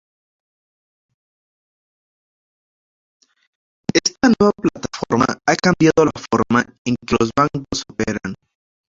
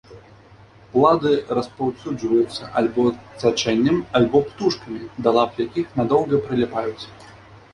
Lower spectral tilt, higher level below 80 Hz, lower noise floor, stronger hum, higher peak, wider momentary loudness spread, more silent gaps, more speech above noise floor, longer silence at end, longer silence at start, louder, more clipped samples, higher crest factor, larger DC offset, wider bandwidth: about the same, -5 dB/octave vs -6 dB/octave; about the same, -48 dBFS vs -52 dBFS; first, under -90 dBFS vs -48 dBFS; neither; about the same, -2 dBFS vs -2 dBFS; first, 12 LU vs 9 LU; first, 6.78-6.85 s vs none; first, over 73 dB vs 27 dB; first, 0.55 s vs 0.2 s; first, 3.95 s vs 0.1 s; first, -18 LUFS vs -21 LUFS; neither; about the same, 20 dB vs 18 dB; neither; second, 7.8 kHz vs 10.5 kHz